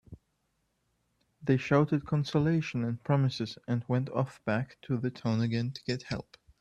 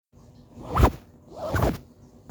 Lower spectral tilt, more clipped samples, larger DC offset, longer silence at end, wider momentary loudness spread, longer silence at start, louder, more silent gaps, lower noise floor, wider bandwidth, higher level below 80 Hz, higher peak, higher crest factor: about the same, -7.5 dB/octave vs -7 dB/octave; neither; neither; about the same, 0.4 s vs 0.5 s; second, 9 LU vs 22 LU; second, 0.1 s vs 0.55 s; second, -31 LUFS vs -26 LUFS; neither; first, -77 dBFS vs -52 dBFS; second, 8.4 kHz vs over 20 kHz; second, -62 dBFS vs -32 dBFS; second, -12 dBFS vs -4 dBFS; about the same, 20 dB vs 22 dB